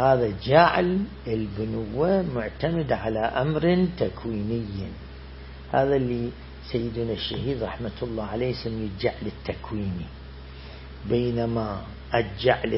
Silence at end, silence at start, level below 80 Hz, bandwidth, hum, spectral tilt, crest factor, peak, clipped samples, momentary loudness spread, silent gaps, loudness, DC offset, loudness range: 0 s; 0 s; -42 dBFS; 5.8 kHz; none; -11 dB/octave; 24 dB; -2 dBFS; under 0.1%; 17 LU; none; -26 LUFS; under 0.1%; 6 LU